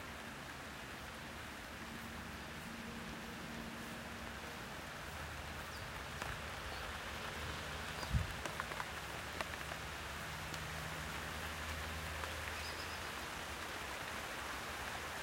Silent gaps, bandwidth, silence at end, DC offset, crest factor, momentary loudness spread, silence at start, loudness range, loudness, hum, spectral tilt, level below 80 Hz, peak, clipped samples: none; 16 kHz; 0 s; under 0.1%; 24 dB; 5 LU; 0 s; 4 LU; -45 LUFS; none; -3.5 dB/octave; -54 dBFS; -20 dBFS; under 0.1%